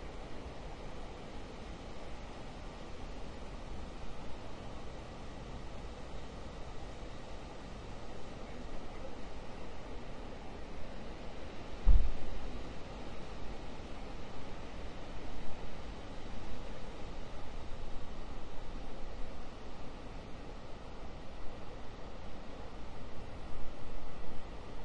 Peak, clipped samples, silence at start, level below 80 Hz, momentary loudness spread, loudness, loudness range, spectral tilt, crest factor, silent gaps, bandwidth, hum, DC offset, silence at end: -14 dBFS; under 0.1%; 0 s; -42 dBFS; 2 LU; -47 LUFS; 8 LU; -6 dB/octave; 22 dB; none; 8.2 kHz; none; under 0.1%; 0 s